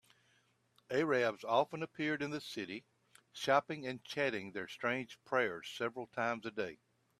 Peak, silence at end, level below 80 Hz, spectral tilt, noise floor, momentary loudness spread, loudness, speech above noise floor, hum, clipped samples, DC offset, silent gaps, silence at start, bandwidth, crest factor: -16 dBFS; 0.45 s; -80 dBFS; -5 dB/octave; -74 dBFS; 10 LU; -37 LUFS; 37 dB; none; under 0.1%; under 0.1%; none; 0.9 s; 14.5 kHz; 22 dB